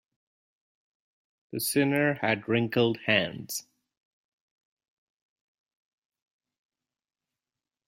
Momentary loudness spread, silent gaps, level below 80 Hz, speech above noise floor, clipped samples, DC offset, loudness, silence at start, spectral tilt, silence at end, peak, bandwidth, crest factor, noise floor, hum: 12 LU; none; -72 dBFS; over 63 dB; under 0.1%; under 0.1%; -27 LUFS; 1.55 s; -4.5 dB/octave; 4.25 s; -8 dBFS; 16 kHz; 24 dB; under -90 dBFS; none